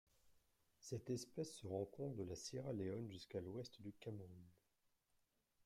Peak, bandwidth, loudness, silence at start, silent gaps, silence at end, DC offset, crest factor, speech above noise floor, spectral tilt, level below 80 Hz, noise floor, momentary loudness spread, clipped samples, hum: -32 dBFS; 16 kHz; -50 LUFS; 0.25 s; none; 1.1 s; under 0.1%; 18 dB; 35 dB; -6 dB/octave; -80 dBFS; -85 dBFS; 9 LU; under 0.1%; none